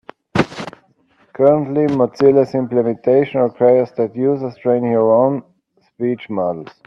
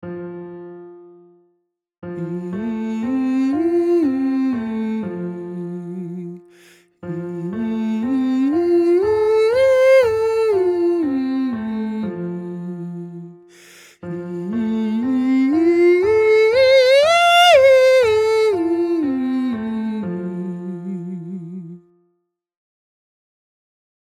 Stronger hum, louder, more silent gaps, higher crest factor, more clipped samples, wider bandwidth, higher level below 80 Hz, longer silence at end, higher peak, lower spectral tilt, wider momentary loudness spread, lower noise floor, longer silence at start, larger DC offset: neither; about the same, -16 LUFS vs -17 LUFS; second, none vs 1.98-2.02 s; about the same, 16 dB vs 16 dB; neither; second, 8 kHz vs 14.5 kHz; about the same, -56 dBFS vs -56 dBFS; second, 0.2 s vs 2.25 s; about the same, 0 dBFS vs -2 dBFS; first, -8 dB/octave vs -5.5 dB/octave; second, 9 LU vs 19 LU; second, -56 dBFS vs -71 dBFS; first, 0.35 s vs 0.05 s; neither